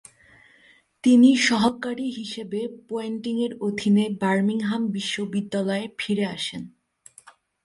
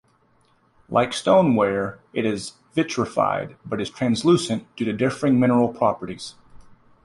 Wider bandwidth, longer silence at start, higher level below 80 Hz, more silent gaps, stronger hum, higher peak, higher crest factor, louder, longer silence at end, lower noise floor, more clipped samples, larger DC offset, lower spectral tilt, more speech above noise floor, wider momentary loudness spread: about the same, 11.5 kHz vs 11.5 kHz; first, 1.05 s vs 0.9 s; second, -66 dBFS vs -56 dBFS; neither; neither; about the same, -6 dBFS vs -4 dBFS; about the same, 18 dB vs 18 dB; about the same, -23 LUFS vs -22 LUFS; about the same, 0.35 s vs 0.45 s; second, -57 dBFS vs -61 dBFS; neither; neither; about the same, -5 dB/octave vs -6 dB/octave; second, 34 dB vs 40 dB; about the same, 14 LU vs 12 LU